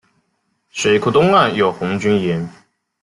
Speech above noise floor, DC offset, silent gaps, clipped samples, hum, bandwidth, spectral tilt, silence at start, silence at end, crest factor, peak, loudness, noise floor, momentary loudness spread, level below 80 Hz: 52 dB; under 0.1%; none; under 0.1%; none; 11.5 kHz; -5.5 dB/octave; 0.75 s; 0.5 s; 16 dB; 0 dBFS; -16 LUFS; -67 dBFS; 12 LU; -52 dBFS